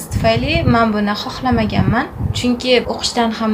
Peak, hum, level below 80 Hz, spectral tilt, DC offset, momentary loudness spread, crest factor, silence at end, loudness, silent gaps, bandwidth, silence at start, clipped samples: 0 dBFS; none; -30 dBFS; -5.5 dB/octave; under 0.1%; 5 LU; 16 dB; 0 s; -16 LUFS; none; 16 kHz; 0 s; under 0.1%